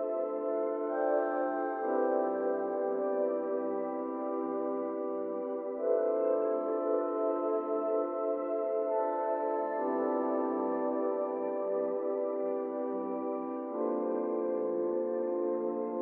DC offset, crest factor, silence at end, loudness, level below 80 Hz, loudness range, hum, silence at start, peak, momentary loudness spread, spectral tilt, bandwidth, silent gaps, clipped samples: under 0.1%; 16 dB; 0 s; -33 LUFS; -84 dBFS; 2 LU; none; 0 s; -16 dBFS; 5 LU; -7 dB/octave; 3.2 kHz; none; under 0.1%